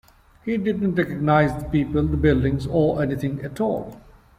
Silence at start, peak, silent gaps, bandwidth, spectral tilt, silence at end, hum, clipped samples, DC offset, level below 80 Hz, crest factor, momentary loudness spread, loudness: 0.45 s; -6 dBFS; none; 14.5 kHz; -8.5 dB/octave; 0.4 s; none; under 0.1%; under 0.1%; -38 dBFS; 16 dB; 9 LU; -22 LUFS